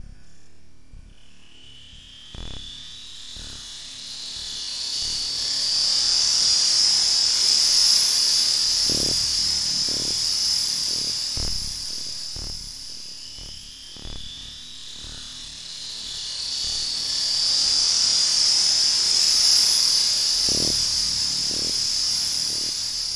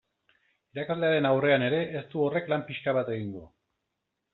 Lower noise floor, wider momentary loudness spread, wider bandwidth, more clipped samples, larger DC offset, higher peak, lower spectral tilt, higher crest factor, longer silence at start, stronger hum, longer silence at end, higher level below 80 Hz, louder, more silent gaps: second, -54 dBFS vs -83 dBFS; first, 20 LU vs 14 LU; first, 12 kHz vs 4.2 kHz; neither; neither; first, -4 dBFS vs -10 dBFS; second, 1 dB/octave vs -4.5 dB/octave; about the same, 18 dB vs 18 dB; second, 0 s vs 0.75 s; neither; second, 0 s vs 0.85 s; first, -46 dBFS vs -70 dBFS; first, -19 LUFS vs -28 LUFS; neither